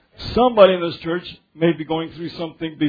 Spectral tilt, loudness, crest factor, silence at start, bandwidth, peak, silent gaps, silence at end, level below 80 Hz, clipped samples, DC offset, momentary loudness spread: -8 dB/octave; -19 LUFS; 20 dB; 0.2 s; 5 kHz; 0 dBFS; none; 0 s; -46 dBFS; under 0.1%; under 0.1%; 16 LU